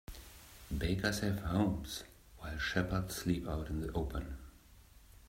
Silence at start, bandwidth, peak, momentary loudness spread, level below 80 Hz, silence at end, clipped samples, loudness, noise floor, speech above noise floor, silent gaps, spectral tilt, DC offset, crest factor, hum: 0.1 s; 16 kHz; -16 dBFS; 18 LU; -48 dBFS; 0 s; under 0.1%; -37 LUFS; -60 dBFS; 24 dB; none; -5.5 dB/octave; under 0.1%; 22 dB; none